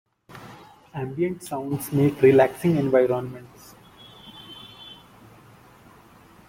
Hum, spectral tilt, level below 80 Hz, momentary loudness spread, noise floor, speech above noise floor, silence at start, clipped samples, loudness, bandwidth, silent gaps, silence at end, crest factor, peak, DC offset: none; -7 dB/octave; -60 dBFS; 26 LU; -51 dBFS; 30 dB; 0.35 s; under 0.1%; -22 LUFS; 16.5 kHz; none; 1.55 s; 20 dB; -6 dBFS; under 0.1%